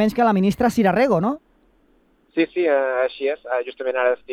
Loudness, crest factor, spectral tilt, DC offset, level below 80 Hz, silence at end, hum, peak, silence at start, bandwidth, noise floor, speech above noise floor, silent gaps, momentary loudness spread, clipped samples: -20 LUFS; 16 dB; -7 dB/octave; under 0.1%; -52 dBFS; 0 s; none; -4 dBFS; 0 s; 15 kHz; -59 dBFS; 40 dB; none; 8 LU; under 0.1%